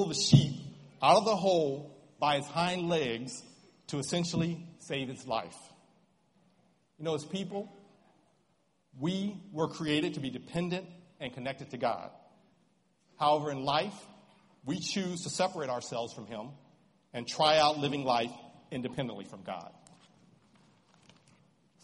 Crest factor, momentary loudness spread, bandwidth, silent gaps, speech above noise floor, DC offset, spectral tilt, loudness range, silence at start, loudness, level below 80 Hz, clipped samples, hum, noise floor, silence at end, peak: 26 dB; 19 LU; 11.5 kHz; none; 42 dB; under 0.1%; -5 dB/octave; 10 LU; 0 s; -32 LUFS; -66 dBFS; under 0.1%; none; -73 dBFS; 2.15 s; -8 dBFS